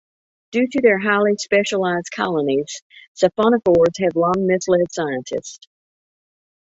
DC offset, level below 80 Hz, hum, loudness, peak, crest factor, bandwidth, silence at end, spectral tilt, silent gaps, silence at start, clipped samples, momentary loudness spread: under 0.1%; -56 dBFS; none; -18 LUFS; -2 dBFS; 18 dB; 8 kHz; 1.1 s; -5 dB/octave; 2.82-2.90 s, 3.08-3.15 s; 0.5 s; under 0.1%; 10 LU